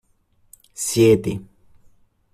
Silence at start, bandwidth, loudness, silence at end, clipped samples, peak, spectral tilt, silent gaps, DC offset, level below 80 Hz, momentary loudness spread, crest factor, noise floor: 0.8 s; 14.5 kHz; -18 LUFS; 0.9 s; under 0.1%; -4 dBFS; -5.5 dB/octave; none; under 0.1%; -54 dBFS; 19 LU; 20 dB; -61 dBFS